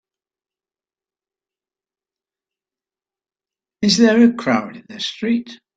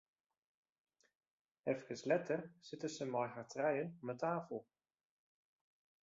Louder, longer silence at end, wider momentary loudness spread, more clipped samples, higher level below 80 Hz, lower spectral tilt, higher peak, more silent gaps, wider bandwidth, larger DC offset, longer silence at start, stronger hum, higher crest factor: first, -17 LUFS vs -42 LUFS; second, 0.2 s vs 1.4 s; first, 14 LU vs 9 LU; neither; first, -64 dBFS vs -86 dBFS; about the same, -4.5 dB/octave vs -5 dB/octave; first, -2 dBFS vs -22 dBFS; neither; first, 9 kHz vs 7.6 kHz; neither; first, 3.8 s vs 1.65 s; neither; about the same, 20 dB vs 22 dB